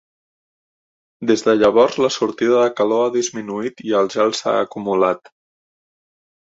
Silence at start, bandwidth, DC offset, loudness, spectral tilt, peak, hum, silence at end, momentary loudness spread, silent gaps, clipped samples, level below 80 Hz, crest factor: 1.2 s; 8 kHz; under 0.1%; -18 LUFS; -4 dB/octave; -2 dBFS; none; 1.3 s; 11 LU; none; under 0.1%; -62 dBFS; 18 dB